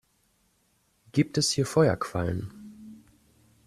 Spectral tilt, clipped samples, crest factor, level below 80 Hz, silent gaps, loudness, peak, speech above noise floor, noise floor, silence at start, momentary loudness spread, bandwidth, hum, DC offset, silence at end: -5 dB/octave; under 0.1%; 20 dB; -56 dBFS; none; -26 LUFS; -8 dBFS; 44 dB; -69 dBFS; 1.15 s; 23 LU; 14 kHz; none; under 0.1%; 0.7 s